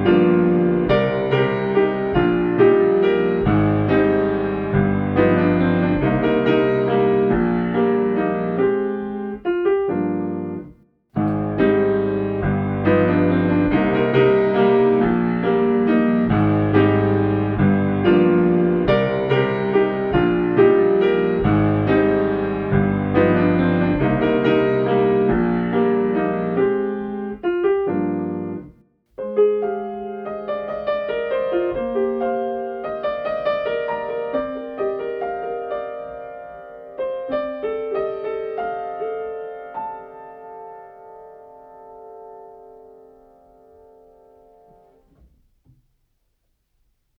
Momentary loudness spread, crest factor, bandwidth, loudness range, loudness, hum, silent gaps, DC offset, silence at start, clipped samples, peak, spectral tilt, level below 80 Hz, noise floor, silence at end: 12 LU; 16 dB; 5.2 kHz; 10 LU; -19 LUFS; none; none; under 0.1%; 0 s; under 0.1%; -2 dBFS; -10.5 dB/octave; -42 dBFS; -69 dBFS; 4.5 s